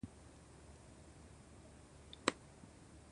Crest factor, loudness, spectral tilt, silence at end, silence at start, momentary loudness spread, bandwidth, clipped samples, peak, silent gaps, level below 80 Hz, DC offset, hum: 38 dB; -43 LUFS; -3.5 dB/octave; 0 s; 0 s; 19 LU; 11 kHz; under 0.1%; -12 dBFS; none; -64 dBFS; under 0.1%; none